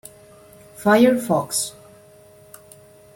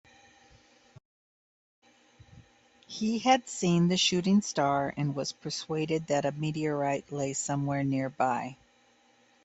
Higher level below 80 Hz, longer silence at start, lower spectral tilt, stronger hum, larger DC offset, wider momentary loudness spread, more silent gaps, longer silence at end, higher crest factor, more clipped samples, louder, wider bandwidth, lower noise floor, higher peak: first, -60 dBFS vs -68 dBFS; second, 0.8 s vs 2.35 s; about the same, -4 dB/octave vs -4.5 dB/octave; neither; neither; about the same, 9 LU vs 9 LU; neither; first, 1.45 s vs 0.9 s; about the same, 20 dB vs 20 dB; neither; first, -19 LUFS vs -29 LUFS; first, 16.5 kHz vs 8.4 kHz; second, -48 dBFS vs -64 dBFS; first, -4 dBFS vs -10 dBFS